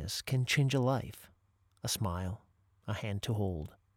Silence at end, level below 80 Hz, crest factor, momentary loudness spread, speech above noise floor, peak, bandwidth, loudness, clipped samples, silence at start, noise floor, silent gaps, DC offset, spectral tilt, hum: 0.25 s; -56 dBFS; 18 dB; 17 LU; 37 dB; -18 dBFS; 17.5 kHz; -34 LUFS; under 0.1%; 0 s; -71 dBFS; none; under 0.1%; -5 dB/octave; none